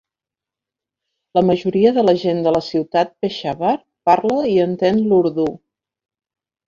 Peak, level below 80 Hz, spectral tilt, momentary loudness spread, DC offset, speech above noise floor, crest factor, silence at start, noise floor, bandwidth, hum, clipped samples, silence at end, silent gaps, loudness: -2 dBFS; -56 dBFS; -7.5 dB/octave; 7 LU; under 0.1%; 72 dB; 16 dB; 1.35 s; -88 dBFS; 7.4 kHz; none; under 0.1%; 1.1 s; none; -17 LUFS